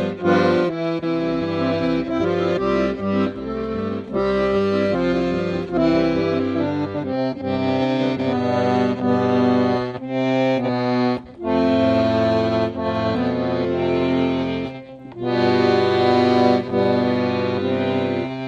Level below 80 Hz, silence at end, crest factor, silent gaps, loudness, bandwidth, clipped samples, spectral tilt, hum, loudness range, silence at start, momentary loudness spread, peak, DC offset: -48 dBFS; 0 s; 16 dB; none; -20 LUFS; 7.6 kHz; under 0.1%; -7.5 dB/octave; none; 3 LU; 0 s; 7 LU; -4 dBFS; under 0.1%